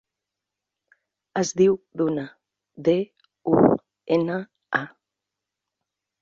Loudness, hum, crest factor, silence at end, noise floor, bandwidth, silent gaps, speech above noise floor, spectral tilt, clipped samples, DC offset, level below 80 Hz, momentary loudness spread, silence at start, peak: -23 LUFS; none; 22 dB; 1.35 s; -86 dBFS; 7.8 kHz; none; 64 dB; -6 dB/octave; under 0.1%; under 0.1%; -62 dBFS; 14 LU; 1.35 s; -4 dBFS